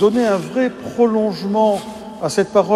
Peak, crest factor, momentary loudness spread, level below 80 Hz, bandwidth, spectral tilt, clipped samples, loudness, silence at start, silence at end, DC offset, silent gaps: 0 dBFS; 16 dB; 7 LU; -56 dBFS; 13.5 kHz; -5.5 dB/octave; under 0.1%; -18 LUFS; 0 s; 0 s; under 0.1%; none